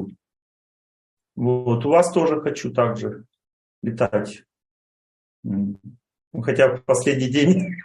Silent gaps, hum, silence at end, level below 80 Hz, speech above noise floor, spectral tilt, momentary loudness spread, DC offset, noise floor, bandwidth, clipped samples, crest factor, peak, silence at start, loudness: 0.42-1.17 s, 3.53-3.82 s, 4.71-5.43 s, 6.27-6.31 s; none; 0 s; -62 dBFS; over 70 dB; -6 dB/octave; 18 LU; under 0.1%; under -90 dBFS; 12 kHz; under 0.1%; 18 dB; -4 dBFS; 0 s; -21 LUFS